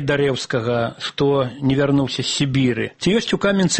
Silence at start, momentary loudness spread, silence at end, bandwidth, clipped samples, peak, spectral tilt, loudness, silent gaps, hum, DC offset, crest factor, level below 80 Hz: 0 s; 4 LU; 0 s; 8.8 kHz; under 0.1%; -6 dBFS; -5 dB/octave; -19 LUFS; none; none; under 0.1%; 14 dB; -48 dBFS